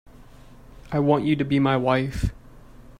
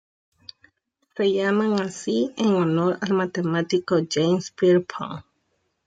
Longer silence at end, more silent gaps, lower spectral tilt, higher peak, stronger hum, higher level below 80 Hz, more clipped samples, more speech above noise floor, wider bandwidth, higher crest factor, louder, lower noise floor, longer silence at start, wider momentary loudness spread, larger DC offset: second, 0.1 s vs 0.65 s; neither; first, -7.5 dB/octave vs -6 dB/octave; about the same, -6 dBFS vs -8 dBFS; neither; first, -40 dBFS vs -68 dBFS; neither; second, 25 dB vs 50 dB; first, 12 kHz vs 9.2 kHz; about the same, 18 dB vs 14 dB; about the same, -23 LUFS vs -22 LUFS; second, -46 dBFS vs -72 dBFS; second, 0.7 s vs 1.15 s; about the same, 9 LU vs 10 LU; neither